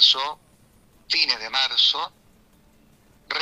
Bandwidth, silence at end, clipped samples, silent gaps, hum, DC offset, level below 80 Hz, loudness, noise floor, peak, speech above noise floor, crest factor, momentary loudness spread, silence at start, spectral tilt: 15.5 kHz; 0 s; under 0.1%; none; none; under 0.1%; -62 dBFS; -20 LUFS; -56 dBFS; -2 dBFS; 33 dB; 22 dB; 15 LU; 0 s; 1 dB/octave